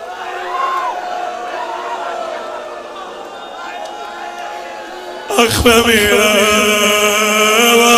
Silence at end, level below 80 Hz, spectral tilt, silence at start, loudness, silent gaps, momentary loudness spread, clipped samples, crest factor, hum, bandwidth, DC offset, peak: 0 s; -40 dBFS; -2 dB/octave; 0 s; -12 LUFS; none; 18 LU; under 0.1%; 14 dB; none; 16.5 kHz; under 0.1%; 0 dBFS